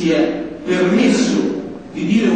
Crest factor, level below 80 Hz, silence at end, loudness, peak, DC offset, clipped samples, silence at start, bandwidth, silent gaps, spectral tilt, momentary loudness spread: 12 dB; -50 dBFS; 0 s; -17 LUFS; -4 dBFS; 0.3%; under 0.1%; 0 s; 9.2 kHz; none; -5.5 dB/octave; 11 LU